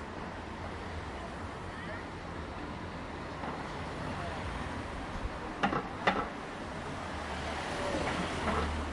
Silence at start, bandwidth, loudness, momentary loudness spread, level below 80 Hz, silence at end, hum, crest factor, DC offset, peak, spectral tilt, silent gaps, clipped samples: 0 s; 11.5 kHz; -37 LUFS; 9 LU; -48 dBFS; 0 s; none; 26 dB; under 0.1%; -12 dBFS; -5 dB/octave; none; under 0.1%